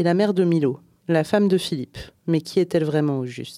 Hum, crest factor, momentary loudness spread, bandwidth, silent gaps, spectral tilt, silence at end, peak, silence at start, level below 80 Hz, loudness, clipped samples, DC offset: none; 16 dB; 11 LU; 15 kHz; none; -7 dB/octave; 0 s; -6 dBFS; 0 s; -56 dBFS; -22 LUFS; under 0.1%; under 0.1%